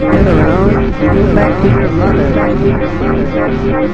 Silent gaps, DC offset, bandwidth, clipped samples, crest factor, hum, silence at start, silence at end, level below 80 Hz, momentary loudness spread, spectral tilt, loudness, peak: none; 5%; 8 kHz; under 0.1%; 10 dB; none; 0 s; 0 s; -20 dBFS; 5 LU; -9 dB/octave; -11 LUFS; 0 dBFS